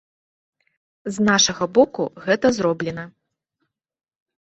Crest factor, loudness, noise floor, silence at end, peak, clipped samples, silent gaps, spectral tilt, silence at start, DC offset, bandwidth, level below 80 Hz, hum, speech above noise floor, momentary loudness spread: 20 dB; -19 LUFS; -76 dBFS; 1.5 s; -2 dBFS; under 0.1%; none; -3.5 dB/octave; 1.05 s; under 0.1%; 8.2 kHz; -58 dBFS; none; 57 dB; 17 LU